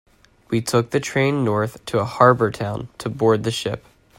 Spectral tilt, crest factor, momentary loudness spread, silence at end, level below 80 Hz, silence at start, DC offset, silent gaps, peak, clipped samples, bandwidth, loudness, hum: -5.5 dB/octave; 20 dB; 13 LU; 0.4 s; -54 dBFS; 0.5 s; under 0.1%; none; 0 dBFS; under 0.1%; 16 kHz; -20 LUFS; none